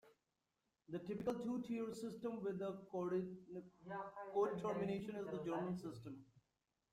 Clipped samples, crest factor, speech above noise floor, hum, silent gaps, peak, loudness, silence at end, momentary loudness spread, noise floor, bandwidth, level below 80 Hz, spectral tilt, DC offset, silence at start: under 0.1%; 18 dB; 44 dB; none; none; -28 dBFS; -45 LUFS; 0.55 s; 12 LU; -89 dBFS; 15 kHz; -78 dBFS; -7.5 dB/octave; under 0.1%; 0.05 s